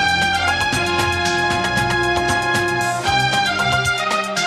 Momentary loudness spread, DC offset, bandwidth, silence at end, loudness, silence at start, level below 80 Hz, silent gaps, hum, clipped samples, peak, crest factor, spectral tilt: 2 LU; under 0.1%; 15.5 kHz; 0 s; -17 LUFS; 0 s; -40 dBFS; none; none; under 0.1%; -6 dBFS; 12 dB; -3 dB/octave